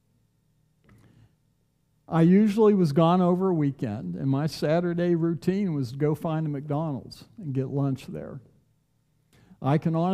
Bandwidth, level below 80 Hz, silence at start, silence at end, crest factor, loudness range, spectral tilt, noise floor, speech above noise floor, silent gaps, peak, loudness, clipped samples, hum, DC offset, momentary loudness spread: 13.5 kHz; -64 dBFS; 2.1 s; 0 s; 18 dB; 9 LU; -8.5 dB/octave; -69 dBFS; 45 dB; none; -8 dBFS; -25 LUFS; under 0.1%; none; under 0.1%; 14 LU